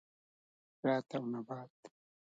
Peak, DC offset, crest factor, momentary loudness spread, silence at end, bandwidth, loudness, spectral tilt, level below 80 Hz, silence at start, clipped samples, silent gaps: -20 dBFS; under 0.1%; 20 dB; 12 LU; 0.5 s; 7.8 kHz; -39 LUFS; -7.5 dB/octave; -88 dBFS; 0.85 s; under 0.1%; 1.70-1.83 s